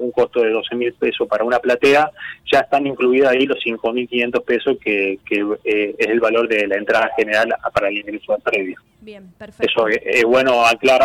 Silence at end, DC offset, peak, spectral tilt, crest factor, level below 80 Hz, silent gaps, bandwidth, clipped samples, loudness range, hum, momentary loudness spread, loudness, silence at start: 0 s; under 0.1%; -6 dBFS; -4 dB/octave; 12 dB; -56 dBFS; none; 16 kHz; under 0.1%; 3 LU; none; 8 LU; -17 LUFS; 0 s